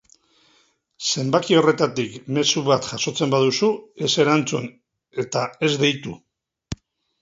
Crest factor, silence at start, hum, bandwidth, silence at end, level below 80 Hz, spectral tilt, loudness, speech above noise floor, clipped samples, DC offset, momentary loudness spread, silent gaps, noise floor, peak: 20 dB; 1 s; none; 8 kHz; 0.45 s; -56 dBFS; -4 dB/octave; -21 LUFS; 41 dB; under 0.1%; under 0.1%; 19 LU; none; -62 dBFS; -2 dBFS